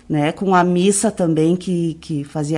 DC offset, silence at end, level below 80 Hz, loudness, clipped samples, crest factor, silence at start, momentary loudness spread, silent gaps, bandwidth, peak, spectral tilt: under 0.1%; 0 s; -52 dBFS; -18 LUFS; under 0.1%; 12 dB; 0.1 s; 8 LU; none; 11.5 kHz; -4 dBFS; -5.5 dB/octave